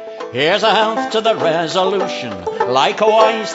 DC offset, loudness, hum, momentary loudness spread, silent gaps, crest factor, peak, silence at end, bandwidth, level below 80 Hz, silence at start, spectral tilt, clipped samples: under 0.1%; -15 LUFS; none; 9 LU; none; 16 dB; 0 dBFS; 0 s; 8 kHz; -60 dBFS; 0 s; -3.5 dB/octave; under 0.1%